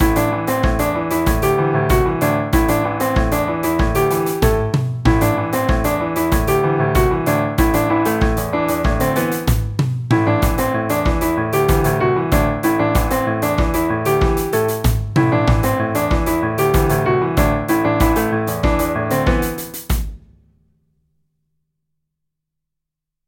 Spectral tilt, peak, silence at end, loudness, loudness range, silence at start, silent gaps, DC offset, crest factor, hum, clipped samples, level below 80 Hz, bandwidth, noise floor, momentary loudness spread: -6 dB/octave; -2 dBFS; 3.1 s; -17 LUFS; 3 LU; 0 s; none; under 0.1%; 16 dB; none; under 0.1%; -24 dBFS; 17 kHz; -81 dBFS; 3 LU